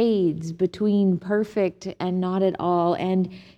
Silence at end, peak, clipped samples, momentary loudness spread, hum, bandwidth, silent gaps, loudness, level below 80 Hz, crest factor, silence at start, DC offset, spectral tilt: 0.15 s; -10 dBFS; under 0.1%; 5 LU; none; 8.4 kHz; none; -24 LUFS; -60 dBFS; 12 dB; 0 s; under 0.1%; -8 dB/octave